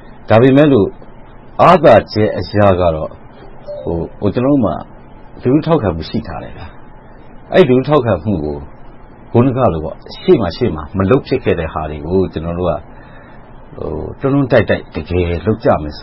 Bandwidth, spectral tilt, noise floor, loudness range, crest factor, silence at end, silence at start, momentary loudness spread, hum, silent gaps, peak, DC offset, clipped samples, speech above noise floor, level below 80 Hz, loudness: 6.6 kHz; -9 dB/octave; -35 dBFS; 5 LU; 14 dB; 0 s; 0 s; 15 LU; none; none; 0 dBFS; under 0.1%; 0.2%; 22 dB; -34 dBFS; -14 LUFS